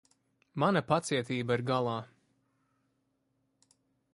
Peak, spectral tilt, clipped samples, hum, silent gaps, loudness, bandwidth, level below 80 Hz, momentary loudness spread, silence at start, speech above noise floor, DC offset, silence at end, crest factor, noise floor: -12 dBFS; -5.5 dB/octave; under 0.1%; none; none; -31 LUFS; 11.5 kHz; -70 dBFS; 8 LU; 0.55 s; 47 dB; under 0.1%; 2.1 s; 22 dB; -77 dBFS